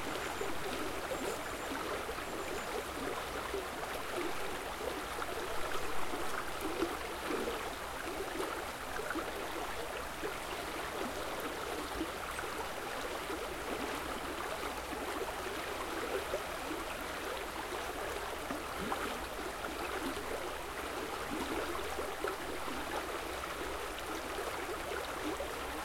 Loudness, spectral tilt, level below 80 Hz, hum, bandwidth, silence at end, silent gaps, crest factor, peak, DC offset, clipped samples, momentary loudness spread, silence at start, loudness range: -39 LUFS; -3 dB/octave; -54 dBFS; none; 16.5 kHz; 0 s; none; 18 dB; -22 dBFS; under 0.1%; under 0.1%; 2 LU; 0 s; 1 LU